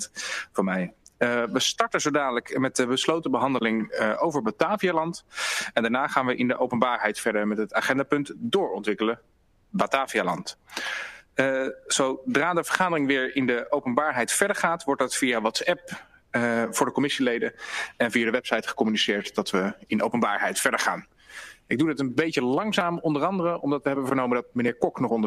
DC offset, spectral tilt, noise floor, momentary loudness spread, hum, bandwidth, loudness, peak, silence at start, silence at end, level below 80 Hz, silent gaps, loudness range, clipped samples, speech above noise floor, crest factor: under 0.1%; -3.5 dB/octave; -45 dBFS; 7 LU; none; 15 kHz; -25 LUFS; -2 dBFS; 0 s; 0 s; -64 dBFS; none; 2 LU; under 0.1%; 20 dB; 24 dB